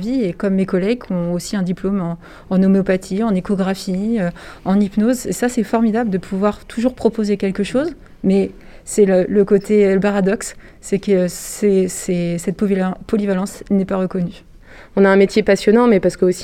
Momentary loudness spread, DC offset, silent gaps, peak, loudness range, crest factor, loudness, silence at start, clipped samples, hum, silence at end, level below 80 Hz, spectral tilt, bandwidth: 9 LU; under 0.1%; none; -2 dBFS; 3 LU; 14 dB; -17 LUFS; 0 s; under 0.1%; none; 0 s; -44 dBFS; -6.5 dB/octave; 14.5 kHz